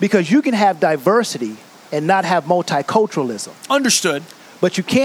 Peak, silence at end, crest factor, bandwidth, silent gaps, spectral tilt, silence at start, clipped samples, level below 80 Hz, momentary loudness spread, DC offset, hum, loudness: -2 dBFS; 0 s; 16 dB; 16.5 kHz; none; -4 dB/octave; 0 s; under 0.1%; -64 dBFS; 11 LU; under 0.1%; none; -17 LUFS